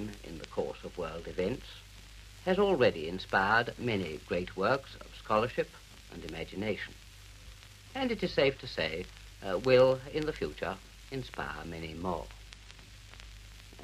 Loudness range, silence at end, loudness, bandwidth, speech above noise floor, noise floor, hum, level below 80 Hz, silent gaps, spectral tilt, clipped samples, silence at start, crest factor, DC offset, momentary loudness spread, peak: 7 LU; 0 s; -32 LUFS; 15 kHz; 20 dB; -52 dBFS; none; -52 dBFS; none; -5.5 dB/octave; under 0.1%; 0 s; 22 dB; under 0.1%; 24 LU; -12 dBFS